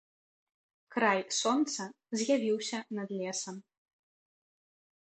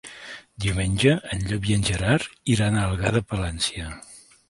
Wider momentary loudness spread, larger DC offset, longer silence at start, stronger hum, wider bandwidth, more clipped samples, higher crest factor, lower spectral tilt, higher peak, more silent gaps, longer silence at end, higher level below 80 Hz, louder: second, 10 LU vs 16 LU; neither; first, 0.9 s vs 0.05 s; neither; second, 9.2 kHz vs 11.5 kHz; neither; about the same, 22 dB vs 20 dB; second, -3 dB/octave vs -5 dB/octave; second, -14 dBFS vs -4 dBFS; neither; first, 1.4 s vs 0.3 s; second, -84 dBFS vs -38 dBFS; second, -32 LUFS vs -23 LUFS